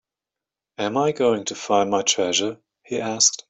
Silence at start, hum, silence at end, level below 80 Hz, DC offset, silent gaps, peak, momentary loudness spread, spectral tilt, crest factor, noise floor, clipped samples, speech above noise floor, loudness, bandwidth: 0.8 s; none; 0.15 s; -66 dBFS; under 0.1%; none; -2 dBFS; 10 LU; -2 dB/octave; 20 dB; -88 dBFS; under 0.1%; 66 dB; -21 LUFS; 8.4 kHz